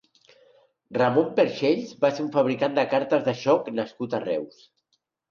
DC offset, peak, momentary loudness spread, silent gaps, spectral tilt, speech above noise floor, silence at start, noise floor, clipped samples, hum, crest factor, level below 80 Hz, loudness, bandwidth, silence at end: under 0.1%; -8 dBFS; 9 LU; none; -6.5 dB/octave; 51 dB; 0.9 s; -74 dBFS; under 0.1%; none; 18 dB; -70 dBFS; -24 LUFS; 7 kHz; 0.85 s